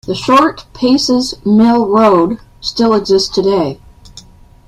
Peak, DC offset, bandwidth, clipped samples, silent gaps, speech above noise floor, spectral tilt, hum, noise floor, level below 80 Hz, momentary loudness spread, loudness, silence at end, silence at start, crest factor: 0 dBFS; under 0.1%; 13 kHz; under 0.1%; none; 27 dB; -5 dB/octave; none; -38 dBFS; -42 dBFS; 9 LU; -12 LUFS; 0.45 s; 0.05 s; 12 dB